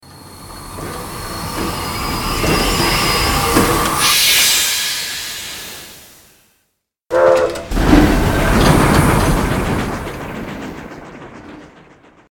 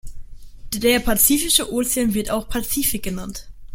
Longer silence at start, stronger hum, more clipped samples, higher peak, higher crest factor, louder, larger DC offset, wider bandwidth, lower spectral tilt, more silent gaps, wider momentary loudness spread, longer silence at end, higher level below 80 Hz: about the same, 0.1 s vs 0.05 s; neither; neither; about the same, 0 dBFS vs 0 dBFS; second, 16 dB vs 22 dB; first, -14 LUFS vs -19 LUFS; neither; about the same, 18 kHz vs 17 kHz; about the same, -3.5 dB/octave vs -2.5 dB/octave; neither; first, 21 LU vs 15 LU; first, 0.65 s vs 0 s; first, -26 dBFS vs -36 dBFS